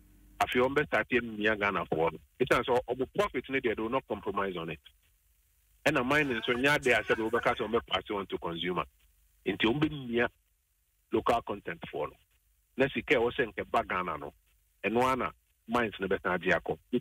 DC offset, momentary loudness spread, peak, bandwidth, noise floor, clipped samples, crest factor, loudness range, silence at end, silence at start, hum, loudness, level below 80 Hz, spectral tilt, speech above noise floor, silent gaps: under 0.1%; 10 LU; -12 dBFS; 16 kHz; -74 dBFS; under 0.1%; 20 dB; 4 LU; 0 s; 0.4 s; none; -31 LUFS; -58 dBFS; -5 dB/octave; 43 dB; none